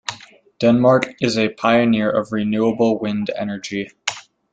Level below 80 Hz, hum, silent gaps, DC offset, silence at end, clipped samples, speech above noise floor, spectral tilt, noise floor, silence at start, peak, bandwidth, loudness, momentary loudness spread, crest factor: -56 dBFS; none; none; under 0.1%; 0.3 s; under 0.1%; 24 dB; -5.5 dB/octave; -42 dBFS; 0.1 s; 0 dBFS; 9 kHz; -19 LUFS; 11 LU; 18 dB